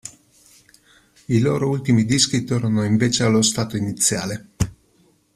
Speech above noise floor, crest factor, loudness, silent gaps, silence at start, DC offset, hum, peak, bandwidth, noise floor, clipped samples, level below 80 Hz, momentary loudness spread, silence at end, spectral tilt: 40 dB; 18 dB; -19 LUFS; none; 0.05 s; under 0.1%; none; -2 dBFS; 15 kHz; -59 dBFS; under 0.1%; -46 dBFS; 10 LU; 0.65 s; -4.5 dB/octave